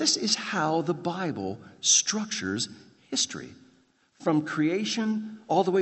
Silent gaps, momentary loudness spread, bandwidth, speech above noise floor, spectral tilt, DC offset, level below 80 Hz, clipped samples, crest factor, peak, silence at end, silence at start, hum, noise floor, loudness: none; 12 LU; 8.6 kHz; 37 dB; -2.5 dB/octave; under 0.1%; -74 dBFS; under 0.1%; 20 dB; -8 dBFS; 0 s; 0 s; none; -64 dBFS; -27 LUFS